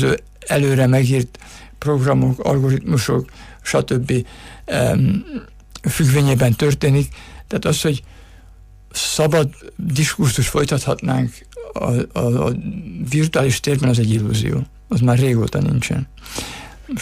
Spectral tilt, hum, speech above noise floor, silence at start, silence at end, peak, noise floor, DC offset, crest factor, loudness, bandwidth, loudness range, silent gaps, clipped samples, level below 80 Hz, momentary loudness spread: -5.5 dB/octave; none; 26 dB; 0 s; 0 s; -6 dBFS; -43 dBFS; under 0.1%; 14 dB; -18 LUFS; 15.5 kHz; 2 LU; none; under 0.1%; -40 dBFS; 13 LU